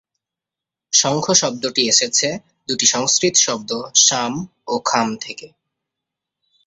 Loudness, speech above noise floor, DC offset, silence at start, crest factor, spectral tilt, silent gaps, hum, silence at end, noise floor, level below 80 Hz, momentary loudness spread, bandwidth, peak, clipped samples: -16 LUFS; 68 dB; under 0.1%; 0.9 s; 20 dB; -1.5 dB/octave; none; none; 1.2 s; -87 dBFS; -62 dBFS; 13 LU; 8.4 kHz; 0 dBFS; under 0.1%